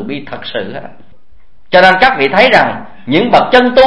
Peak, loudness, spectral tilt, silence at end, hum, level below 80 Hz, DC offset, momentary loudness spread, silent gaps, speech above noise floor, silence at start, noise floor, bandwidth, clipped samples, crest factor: 0 dBFS; -9 LUFS; -5.5 dB/octave; 0 s; none; -40 dBFS; 3%; 16 LU; none; 39 dB; 0 s; -49 dBFS; 11 kHz; 0.9%; 10 dB